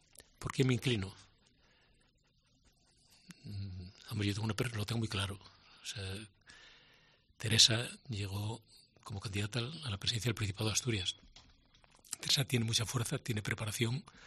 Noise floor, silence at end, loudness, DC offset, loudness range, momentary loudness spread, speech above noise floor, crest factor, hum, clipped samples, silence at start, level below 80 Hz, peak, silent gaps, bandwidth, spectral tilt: -72 dBFS; 0 s; -35 LUFS; under 0.1%; 9 LU; 17 LU; 37 dB; 28 dB; none; under 0.1%; 0.4 s; -64 dBFS; -10 dBFS; none; 13 kHz; -3.5 dB/octave